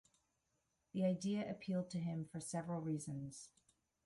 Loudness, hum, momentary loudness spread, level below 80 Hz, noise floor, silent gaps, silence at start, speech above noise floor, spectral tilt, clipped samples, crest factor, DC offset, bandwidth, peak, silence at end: -43 LUFS; none; 10 LU; -78 dBFS; -85 dBFS; none; 0.95 s; 43 dB; -6.5 dB/octave; under 0.1%; 16 dB; under 0.1%; 11.5 kHz; -26 dBFS; 0.55 s